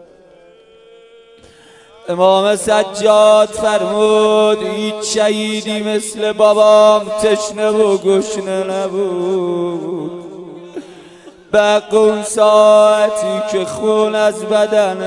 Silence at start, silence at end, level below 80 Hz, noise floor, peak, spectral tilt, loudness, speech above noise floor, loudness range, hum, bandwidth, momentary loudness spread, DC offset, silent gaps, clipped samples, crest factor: 2.05 s; 0 s; -56 dBFS; -44 dBFS; 0 dBFS; -4 dB/octave; -13 LUFS; 32 dB; 6 LU; none; 11.5 kHz; 13 LU; under 0.1%; none; under 0.1%; 14 dB